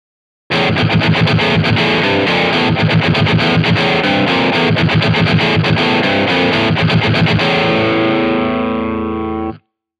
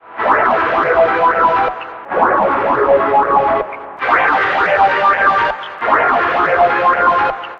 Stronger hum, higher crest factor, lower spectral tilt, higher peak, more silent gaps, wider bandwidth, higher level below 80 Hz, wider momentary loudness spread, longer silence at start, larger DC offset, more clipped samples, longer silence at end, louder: neither; about the same, 12 dB vs 14 dB; about the same, -6.5 dB/octave vs -6 dB/octave; about the same, -2 dBFS vs 0 dBFS; neither; first, 10 kHz vs 7.4 kHz; first, -38 dBFS vs -46 dBFS; about the same, 5 LU vs 7 LU; first, 0.5 s vs 0.05 s; neither; neither; first, 0.4 s vs 0 s; about the same, -13 LUFS vs -13 LUFS